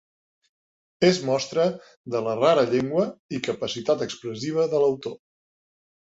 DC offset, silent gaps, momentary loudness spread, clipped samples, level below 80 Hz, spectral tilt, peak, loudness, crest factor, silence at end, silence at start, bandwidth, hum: under 0.1%; 1.97-2.04 s, 3.19-3.29 s; 10 LU; under 0.1%; -66 dBFS; -5 dB/octave; -6 dBFS; -24 LUFS; 20 dB; 0.85 s; 1 s; 8 kHz; none